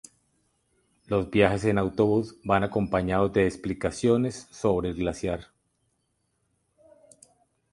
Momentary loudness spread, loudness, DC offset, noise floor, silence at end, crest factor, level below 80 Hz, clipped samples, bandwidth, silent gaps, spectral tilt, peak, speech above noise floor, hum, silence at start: 8 LU; -26 LUFS; under 0.1%; -74 dBFS; 2.3 s; 22 dB; -48 dBFS; under 0.1%; 11.5 kHz; none; -6.5 dB/octave; -6 dBFS; 49 dB; none; 1.1 s